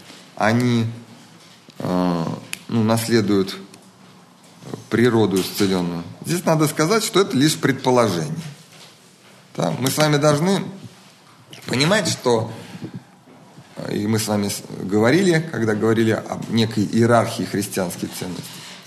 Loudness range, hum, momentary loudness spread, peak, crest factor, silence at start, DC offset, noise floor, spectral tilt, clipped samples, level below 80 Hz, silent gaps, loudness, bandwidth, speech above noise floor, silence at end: 4 LU; none; 18 LU; -2 dBFS; 18 dB; 0.05 s; under 0.1%; -48 dBFS; -5 dB/octave; under 0.1%; -62 dBFS; none; -20 LUFS; 13 kHz; 29 dB; 0.05 s